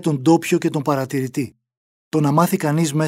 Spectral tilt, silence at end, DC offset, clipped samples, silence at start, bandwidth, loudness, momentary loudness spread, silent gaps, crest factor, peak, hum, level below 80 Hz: -6.5 dB/octave; 0 s; under 0.1%; under 0.1%; 0 s; 16 kHz; -19 LUFS; 9 LU; 1.77-2.11 s; 16 dB; -4 dBFS; none; -66 dBFS